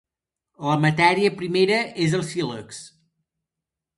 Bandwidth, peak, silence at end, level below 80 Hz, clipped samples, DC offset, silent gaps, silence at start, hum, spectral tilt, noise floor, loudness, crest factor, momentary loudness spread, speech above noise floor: 11.5 kHz; -4 dBFS; 1.1 s; -64 dBFS; under 0.1%; under 0.1%; none; 0.6 s; none; -5.5 dB/octave; -87 dBFS; -21 LUFS; 20 dB; 16 LU; 66 dB